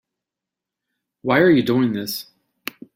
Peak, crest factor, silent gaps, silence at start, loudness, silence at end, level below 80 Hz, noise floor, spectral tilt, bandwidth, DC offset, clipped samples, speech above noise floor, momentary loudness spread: -2 dBFS; 18 dB; none; 1.25 s; -18 LUFS; 0.75 s; -60 dBFS; -86 dBFS; -6 dB/octave; 16.5 kHz; under 0.1%; under 0.1%; 69 dB; 19 LU